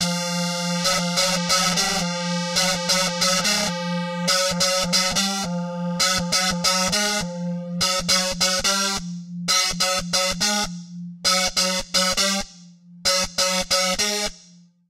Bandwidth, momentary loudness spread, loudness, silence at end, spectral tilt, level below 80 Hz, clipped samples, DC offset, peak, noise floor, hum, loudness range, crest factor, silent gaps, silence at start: 16.5 kHz; 8 LU; -20 LUFS; 0.5 s; -2 dB/octave; -46 dBFS; under 0.1%; under 0.1%; -6 dBFS; -51 dBFS; none; 1 LU; 16 dB; none; 0 s